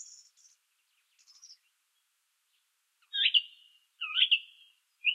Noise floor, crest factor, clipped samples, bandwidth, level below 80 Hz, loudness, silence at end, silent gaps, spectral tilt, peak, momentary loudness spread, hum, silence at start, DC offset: -77 dBFS; 24 dB; under 0.1%; 13.5 kHz; under -90 dBFS; -27 LUFS; 0 s; none; 10.5 dB/octave; -12 dBFS; 19 LU; none; 0 s; under 0.1%